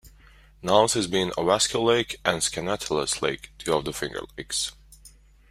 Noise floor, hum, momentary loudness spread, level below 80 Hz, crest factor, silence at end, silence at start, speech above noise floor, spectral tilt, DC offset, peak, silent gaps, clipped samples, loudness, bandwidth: -53 dBFS; none; 11 LU; -52 dBFS; 24 dB; 0.4 s; 0.05 s; 28 dB; -3 dB/octave; under 0.1%; -4 dBFS; none; under 0.1%; -25 LUFS; 16 kHz